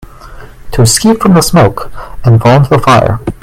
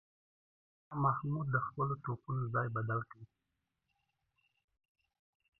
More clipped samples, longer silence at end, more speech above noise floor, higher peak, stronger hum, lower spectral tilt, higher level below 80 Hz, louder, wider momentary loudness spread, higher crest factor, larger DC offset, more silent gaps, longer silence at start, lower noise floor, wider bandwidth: first, 0.4% vs under 0.1%; second, 0.1 s vs 2.35 s; second, 22 dB vs 50 dB; first, 0 dBFS vs -18 dBFS; neither; second, -5.5 dB/octave vs -9.5 dB/octave; first, -28 dBFS vs -74 dBFS; first, -7 LUFS vs -37 LUFS; first, 10 LU vs 7 LU; second, 8 dB vs 22 dB; neither; neither; second, 0 s vs 0.9 s; second, -29 dBFS vs -86 dBFS; first, 15.5 kHz vs 3 kHz